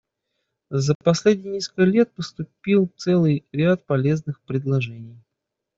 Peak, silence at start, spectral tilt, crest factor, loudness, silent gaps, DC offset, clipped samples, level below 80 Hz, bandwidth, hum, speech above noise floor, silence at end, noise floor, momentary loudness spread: -4 dBFS; 0.7 s; -7 dB/octave; 18 dB; -21 LUFS; 0.95-1.00 s; under 0.1%; under 0.1%; -60 dBFS; 7.8 kHz; none; 61 dB; 0.65 s; -82 dBFS; 11 LU